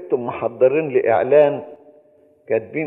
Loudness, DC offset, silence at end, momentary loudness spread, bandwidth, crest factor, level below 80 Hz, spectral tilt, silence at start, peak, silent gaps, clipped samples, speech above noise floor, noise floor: -18 LUFS; under 0.1%; 0 s; 9 LU; 4 kHz; 16 dB; -66 dBFS; -10 dB/octave; 0 s; -2 dBFS; none; under 0.1%; 36 dB; -53 dBFS